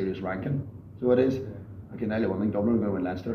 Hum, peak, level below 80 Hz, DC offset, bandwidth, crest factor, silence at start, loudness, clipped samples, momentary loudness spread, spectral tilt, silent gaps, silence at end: none; -10 dBFS; -56 dBFS; under 0.1%; 6.6 kHz; 18 dB; 0 s; -28 LUFS; under 0.1%; 16 LU; -9.5 dB/octave; none; 0 s